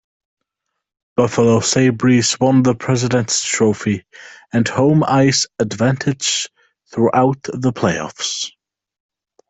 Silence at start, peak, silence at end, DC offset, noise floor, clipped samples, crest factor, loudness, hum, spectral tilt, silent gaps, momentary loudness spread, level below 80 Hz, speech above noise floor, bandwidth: 1.15 s; -2 dBFS; 1 s; under 0.1%; -78 dBFS; under 0.1%; 16 dB; -16 LUFS; none; -4.5 dB/octave; none; 9 LU; -54 dBFS; 62 dB; 8.4 kHz